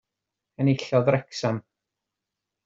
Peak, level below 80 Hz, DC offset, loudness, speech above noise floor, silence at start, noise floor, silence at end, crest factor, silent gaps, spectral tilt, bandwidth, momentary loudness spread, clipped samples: -8 dBFS; -66 dBFS; under 0.1%; -25 LUFS; 62 dB; 0.6 s; -86 dBFS; 1.05 s; 20 dB; none; -7 dB/octave; 7.8 kHz; 7 LU; under 0.1%